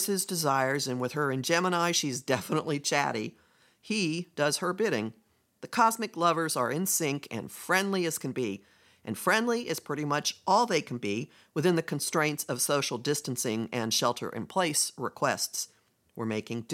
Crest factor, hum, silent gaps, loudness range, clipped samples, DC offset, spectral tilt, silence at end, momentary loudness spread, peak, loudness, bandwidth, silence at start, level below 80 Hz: 20 dB; none; none; 2 LU; under 0.1%; under 0.1%; -3.5 dB/octave; 0 s; 9 LU; -10 dBFS; -29 LUFS; 16.5 kHz; 0 s; -78 dBFS